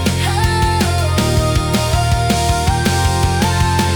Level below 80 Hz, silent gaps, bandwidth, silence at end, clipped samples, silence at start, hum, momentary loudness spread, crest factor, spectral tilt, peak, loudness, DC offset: -24 dBFS; none; over 20 kHz; 0 s; under 0.1%; 0 s; none; 1 LU; 10 dB; -5 dB/octave; -4 dBFS; -15 LUFS; under 0.1%